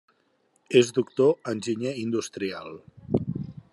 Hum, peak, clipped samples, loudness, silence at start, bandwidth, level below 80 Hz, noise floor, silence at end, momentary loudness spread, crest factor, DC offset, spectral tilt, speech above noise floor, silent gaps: none; -6 dBFS; under 0.1%; -26 LUFS; 0.7 s; 11.5 kHz; -62 dBFS; -68 dBFS; 0.2 s; 15 LU; 22 dB; under 0.1%; -5.5 dB/octave; 43 dB; none